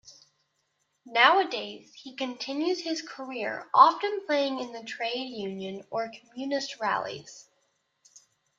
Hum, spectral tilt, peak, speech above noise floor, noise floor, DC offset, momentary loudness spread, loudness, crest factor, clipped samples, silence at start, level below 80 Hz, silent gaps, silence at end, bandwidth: none; -3 dB/octave; -4 dBFS; 48 dB; -76 dBFS; under 0.1%; 17 LU; -27 LUFS; 24 dB; under 0.1%; 0.05 s; -80 dBFS; none; 0.4 s; 7.6 kHz